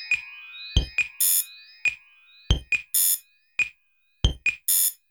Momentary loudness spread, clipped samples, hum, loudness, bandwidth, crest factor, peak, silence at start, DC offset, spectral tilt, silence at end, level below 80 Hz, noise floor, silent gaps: 11 LU; under 0.1%; none; -23 LUFS; over 20 kHz; 22 dB; -6 dBFS; 0 s; under 0.1%; -1 dB/octave; 0.2 s; -34 dBFS; -68 dBFS; none